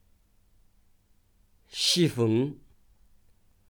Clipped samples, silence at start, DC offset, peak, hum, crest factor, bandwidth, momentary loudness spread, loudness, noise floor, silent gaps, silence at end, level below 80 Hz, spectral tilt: under 0.1%; 1.75 s; under 0.1%; -12 dBFS; none; 20 dB; over 20 kHz; 17 LU; -26 LUFS; -64 dBFS; none; 1.15 s; -64 dBFS; -4.5 dB/octave